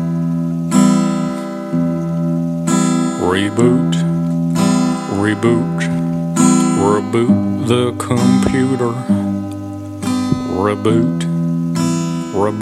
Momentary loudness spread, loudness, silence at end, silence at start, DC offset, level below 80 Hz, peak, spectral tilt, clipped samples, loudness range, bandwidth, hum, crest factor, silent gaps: 6 LU; -16 LUFS; 0 s; 0 s; under 0.1%; -46 dBFS; 0 dBFS; -6 dB/octave; under 0.1%; 3 LU; 13.5 kHz; none; 14 dB; none